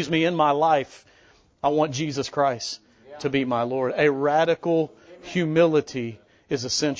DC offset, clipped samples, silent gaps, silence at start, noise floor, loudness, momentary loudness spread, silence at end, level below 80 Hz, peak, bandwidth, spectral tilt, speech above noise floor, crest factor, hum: under 0.1%; under 0.1%; none; 0 s; -57 dBFS; -23 LUFS; 12 LU; 0 s; -62 dBFS; -6 dBFS; 8 kHz; -5 dB/octave; 34 dB; 18 dB; none